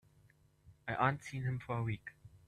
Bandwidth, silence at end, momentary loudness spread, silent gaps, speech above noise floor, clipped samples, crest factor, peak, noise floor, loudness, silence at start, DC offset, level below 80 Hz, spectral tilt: 11.5 kHz; 0.1 s; 13 LU; none; 31 dB; under 0.1%; 24 dB; -16 dBFS; -68 dBFS; -38 LUFS; 0.65 s; under 0.1%; -66 dBFS; -7 dB/octave